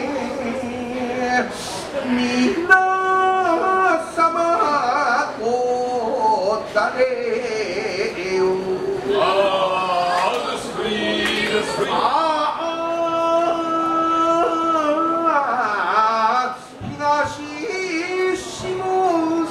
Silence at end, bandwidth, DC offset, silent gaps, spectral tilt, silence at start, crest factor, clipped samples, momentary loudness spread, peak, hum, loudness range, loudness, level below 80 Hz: 0 s; 13.5 kHz; under 0.1%; none; -4 dB/octave; 0 s; 18 dB; under 0.1%; 8 LU; -2 dBFS; none; 3 LU; -19 LUFS; -54 dBFS